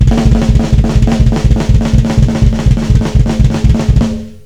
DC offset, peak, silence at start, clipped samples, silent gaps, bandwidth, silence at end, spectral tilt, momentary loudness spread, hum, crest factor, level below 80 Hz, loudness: 2%; 0 dBFS; 0 s; 3%; none; 10.5 kHz; 0.1 s; -7.5 dB/octave; 2 LU; none; 8 dB; -12 dBFS; -11 LUFS